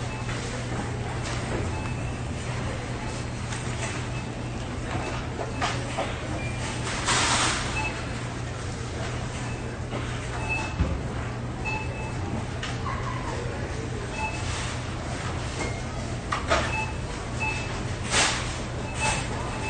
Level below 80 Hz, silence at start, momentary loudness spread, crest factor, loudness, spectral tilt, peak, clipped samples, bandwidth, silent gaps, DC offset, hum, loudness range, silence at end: -40 dBFS; 0 s; 8 LU; 22 dB; -29 LUFS; -4 dB/octave; -8 dBFS; under 0.1%; 10 kHz; none; under 0.1%; none; 4 LU; 0 s